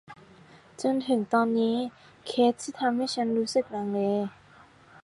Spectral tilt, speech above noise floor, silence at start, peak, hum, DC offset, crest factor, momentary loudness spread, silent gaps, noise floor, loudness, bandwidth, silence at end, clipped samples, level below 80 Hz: -5 dB/octave; 28 dB; 0.1 s; -12 dBFS; none; under 0.1%; 16 dB; 7 LU; none; -55 dBFS; -27 LUFS; 11.5 kHz; 0.75 s; under 0.1%; -72 dBFS